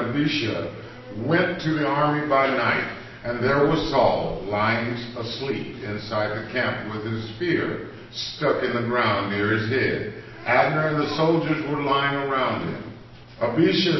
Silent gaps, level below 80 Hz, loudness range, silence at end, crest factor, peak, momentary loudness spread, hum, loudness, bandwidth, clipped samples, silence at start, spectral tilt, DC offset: none; -50 dBFS; 5 LU; 0 s; 18 dB; -6 dBFS; 11 LU; none; -23 LUFS; 6.2 kHz; under 0.1%; 0 s; -6.5 dB/octave; under 0.1%